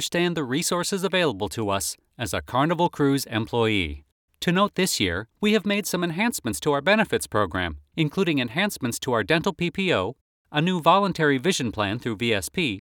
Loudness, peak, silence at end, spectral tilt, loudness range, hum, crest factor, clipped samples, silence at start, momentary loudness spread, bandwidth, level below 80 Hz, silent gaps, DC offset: -24 LUFS; -4 dBFS; 0.15 s; -4.5 dB/octave; 2 LU; none; 20 dB; under 0.1%; 0 s; 7 LU; 19 kHz; -50 dBFS; 4.12-4.28 s, 10.21-10.45 s; under 0.1%